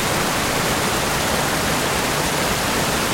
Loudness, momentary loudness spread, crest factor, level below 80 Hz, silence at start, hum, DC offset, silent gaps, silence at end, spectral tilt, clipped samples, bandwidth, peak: -19 LUFS; 0 LU; 14 dB; -36 dBFS; 0 s; none; under 0.1%; none; 0 s; -3 dB/octave; under 0.1%; 16.5 kHz; -6 dBFS